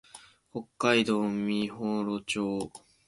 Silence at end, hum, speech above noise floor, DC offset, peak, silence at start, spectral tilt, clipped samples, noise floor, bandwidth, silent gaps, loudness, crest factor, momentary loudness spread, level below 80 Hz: 0.3 s; none; 25 dB; under 0.1%; -10 dBFS; 0.15 s; -5 dB/octave; under 0.1%; -54 dBFS; 11.5 kHz; none; -29 LUFS; 20 dB; 16 LU; -66 dBFS